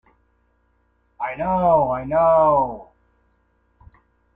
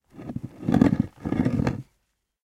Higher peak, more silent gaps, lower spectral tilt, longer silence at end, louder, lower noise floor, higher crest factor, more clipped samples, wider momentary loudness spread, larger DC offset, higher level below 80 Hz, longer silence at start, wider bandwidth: second, -6 dBFS vs -2 dBFS; neither; first, -10 dB/octave vs -8.5 dB/octave; first, 1.5 s vs 0.6 s; first, -19 LUFS vs -24 LUFS; second, -64 dBFS vs -74 dBFS; second, 16 dB vs 24 dB; neither; about the same, 15 LU vs 16 LU; neither; about the same, -48 dBFS vs -44 dBFS; first, 1.2 s vs 0.15 s; second, 3.7 kHz vs 11 kHz